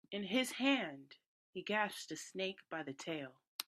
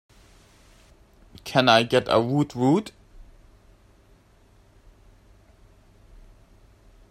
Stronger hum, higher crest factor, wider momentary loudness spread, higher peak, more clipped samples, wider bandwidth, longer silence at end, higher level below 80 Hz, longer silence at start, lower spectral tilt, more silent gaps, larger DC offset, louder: neither; about the same, 22 dB vs 26 dB; about the same, 13 LU vs 12 LU; second, -20 dBFS vs -2 dBFS; neither; about the same, 14 kHz vs 14.5 kHz; second, 0.05 s vs 4.2 s; second, -86 dBFS vs -54 dBFS; second, 0.1 s vs 1.45 s; second, -3.5 dB/octave vs -5.5 dB/octave; first, 1.26-1.53 s, 3.48-3.59 s vs none; neither; second, -39 LUFS vs -21 LUFS